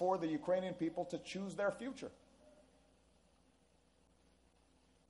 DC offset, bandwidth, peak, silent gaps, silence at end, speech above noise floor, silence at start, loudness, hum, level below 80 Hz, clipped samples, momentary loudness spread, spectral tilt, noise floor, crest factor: under 0.1%; 11.5 kHz; -22 dBFS; none; 2.6 s; 33 dB; 0 s; -41 LUFS; none; -76 dBFS; under 0.1%; 10 LU; -6 dB/octave; -73 dBFS; 20 dB